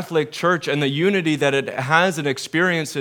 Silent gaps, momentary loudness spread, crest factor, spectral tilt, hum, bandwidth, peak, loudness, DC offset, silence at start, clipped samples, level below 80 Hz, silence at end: none; 5 LU; 20 dB; -5 dB/octave; none; 18.5 kHz; 0 dBFS; -20 LUFS; under 0.1%; 0 s; under 0.1%; -72 dBFS; 0 s